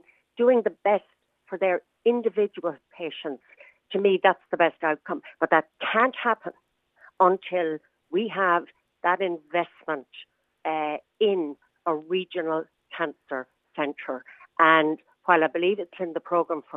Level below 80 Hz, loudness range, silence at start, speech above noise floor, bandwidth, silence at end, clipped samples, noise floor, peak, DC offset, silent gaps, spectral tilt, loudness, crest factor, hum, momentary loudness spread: -84 dBFS; 5 LU; 0.4 s; 33 dB; 4 kHz; 0 s; under 0.1%; -57 dBFS; -2 dBFS; under 0.1%; none; -7.5 dB/octave; -25 LUFS; 24 dB; none; 14 LU